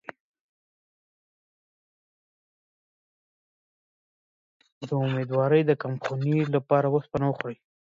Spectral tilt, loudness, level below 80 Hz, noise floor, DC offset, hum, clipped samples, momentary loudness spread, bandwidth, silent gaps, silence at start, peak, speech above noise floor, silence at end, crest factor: -9 dB/octave; -25 LUFS; -64 dBFS; under -90 dBFS; under 0.1%; none; under 0.1%; 12 LU; 7.4 kHz; none; 4.8 s; -8 dBFS; over 65 dB; 0.3 s; 20 dB